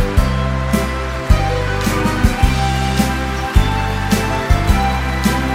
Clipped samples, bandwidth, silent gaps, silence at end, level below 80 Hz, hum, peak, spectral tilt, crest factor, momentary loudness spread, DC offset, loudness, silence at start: under 0.1%; 16.5 kHz; none; 0 s; -20 dBFS; none; 0 dBFS; -5.5 dB/octave; 16 dB; 3 LU; 0.2%; -17 LUFS; 0 s